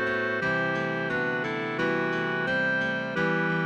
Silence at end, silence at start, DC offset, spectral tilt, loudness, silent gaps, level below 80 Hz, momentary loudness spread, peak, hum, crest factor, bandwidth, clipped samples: 0 s; 0 s; under 0.1%; -6.5 dB/octave; -27 LUFS; none; -62 dBFS; 3 LU; -14 dBFS; none; 12 dB; 9 kHz; under 0.1%